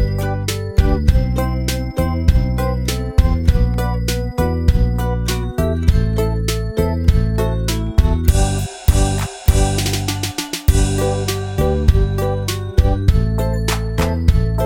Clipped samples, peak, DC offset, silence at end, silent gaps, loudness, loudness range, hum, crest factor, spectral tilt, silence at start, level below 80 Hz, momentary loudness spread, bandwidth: under 0.1%; 0 dBFS; under 0.1%; 0 s; none; -18 LUFS; 1 LU; none; 16 dB; -6 dB/octave; 0 s; -18 dBFS; 5 LU; 17 kHz